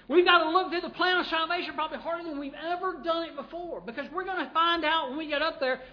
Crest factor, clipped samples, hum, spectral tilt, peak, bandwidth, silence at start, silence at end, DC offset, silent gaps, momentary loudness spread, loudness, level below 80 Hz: 20 dB; under 0.1%; none; -5 dB/octave; -8 dBFS; 5.4 kHz; 0.1 s; 0 s; under 0.1%; none; 15 LU; -28 LUFS; -62 dBFS